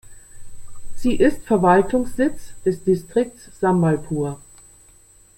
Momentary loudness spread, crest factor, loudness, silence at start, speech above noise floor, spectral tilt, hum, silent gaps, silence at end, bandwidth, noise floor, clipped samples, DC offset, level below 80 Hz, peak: 10 LU; 18 dB; -20 LUFS; 0.05 s; 32 dB; -7 dB/octave; none; none; 1 s; 16.5 kHz; -51 dBFS; under 0.1%; under 0.1%; -40 dBFS; -4 dBFS